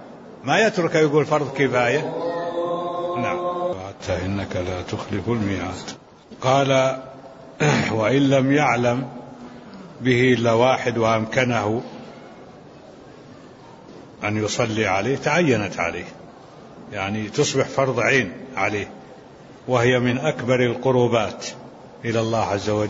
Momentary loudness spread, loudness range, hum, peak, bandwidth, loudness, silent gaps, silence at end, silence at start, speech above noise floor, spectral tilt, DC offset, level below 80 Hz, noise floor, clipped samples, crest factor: 20 LU; 6 LU; none; -4 dBFS; 8 kHz; -21 LUFS; none; 0 s; 0 s; 23 dB; -5.5 dB/octave; under 0.1%; -54 dBFS; -43 dBFS; under 0.1%; 18 dB